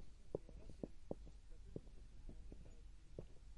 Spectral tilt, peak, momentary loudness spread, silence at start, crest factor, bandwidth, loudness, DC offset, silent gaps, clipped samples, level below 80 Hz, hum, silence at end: -7.5 dB/octave; -28 dBFS; 10 LU; 0 s; 24 dB; 11 kHz; -57 LUFS; under 0.1%; none; under 0.1%; -58 dBFS; none; 0 s